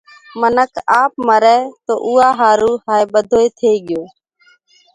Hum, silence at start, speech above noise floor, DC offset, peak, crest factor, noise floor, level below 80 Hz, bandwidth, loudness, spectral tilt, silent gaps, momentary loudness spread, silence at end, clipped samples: none; 0.35 s; 40 dB; under 0.1%; 0 dBFS; 14 dB; -53 dBFS; -54 dBFS; 11 kHz; -14 LUFS; -4 dB/octave; none; 9 LU; 0.9 s; under 0.1%